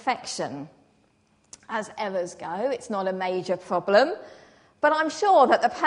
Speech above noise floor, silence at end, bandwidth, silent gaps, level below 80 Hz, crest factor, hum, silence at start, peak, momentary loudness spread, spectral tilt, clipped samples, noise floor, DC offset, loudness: 40 dB; 0 s; 10.5 kHz; none; -72 dBFS; 20 dB; none; 0.05 s; -4 dBFS; 14 LU; -4 dB/octave; under 0.1%; -64 dBFS; under 0.1%; -24 LUFS